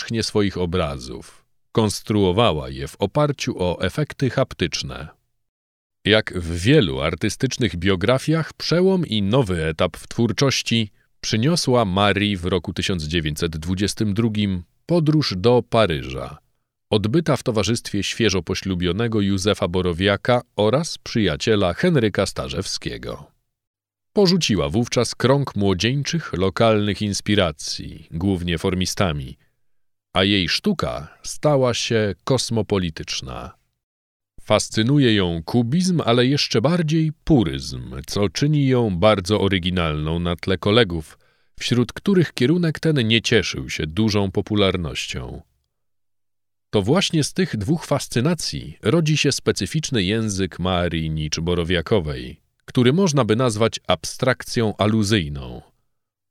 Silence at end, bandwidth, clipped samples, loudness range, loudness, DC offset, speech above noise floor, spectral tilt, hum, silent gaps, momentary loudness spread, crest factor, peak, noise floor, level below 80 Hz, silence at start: 0.7 s; 15 kHz; under 0.1%; 3 LU; -20 LUFS; under 0.1%; 66 dB; -5 dB/octave; none; 5.49-5.90 s, 23.67-23.74 s, 33.83-34.20 s; 9 LU; 20 dB; 0 dBFS; -86 dBFS; -42 dBFS; 0 s